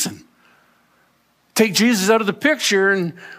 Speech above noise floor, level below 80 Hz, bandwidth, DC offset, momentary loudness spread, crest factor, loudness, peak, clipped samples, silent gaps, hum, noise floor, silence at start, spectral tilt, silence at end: 44 dB; -70 dBFS; 15.5 kHz; under 0.1%; 7 LU; 18 dB; -17 LUFS; -2 dBFS; under 0.1%; none; none; -61 dBFS; 0 s; -3.5 dB/octave; 0 s